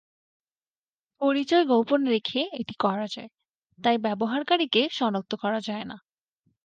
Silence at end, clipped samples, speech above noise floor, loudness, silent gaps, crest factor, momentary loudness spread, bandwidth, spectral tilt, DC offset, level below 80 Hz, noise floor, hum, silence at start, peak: 0.7 s; under 0.1%; over 65 dB; -25 LUFS; 3.50-3.62 s; 18 dB; 12 LU; 8.8 kHz; -5.5 dB/octave; under 0.1%; -74 dBFS; under -90 dBFS; none; 1.2 s; -10 dBFS